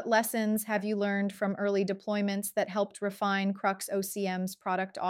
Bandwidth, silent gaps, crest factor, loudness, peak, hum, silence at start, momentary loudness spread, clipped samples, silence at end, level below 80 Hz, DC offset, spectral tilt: 16.5 kHz; none; 16 dB; -31 LUFS; -14 dBFS; none; 0 s; 4 LU; under 0.1%; 0 s; -80 dBFS; under 0.1%; -5 dB/octave